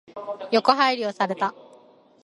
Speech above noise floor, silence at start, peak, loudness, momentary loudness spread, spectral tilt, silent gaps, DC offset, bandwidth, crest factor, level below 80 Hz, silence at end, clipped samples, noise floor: 31 dB; 0.15 s; -2 dBFS; -22 LUFS; 13 LU; -4.5 dB/octave; none; under 0.1%; 11.5 kHz; 24 dB; -74 dBFS; 0.75 s; under 0.1%; -53 dBFS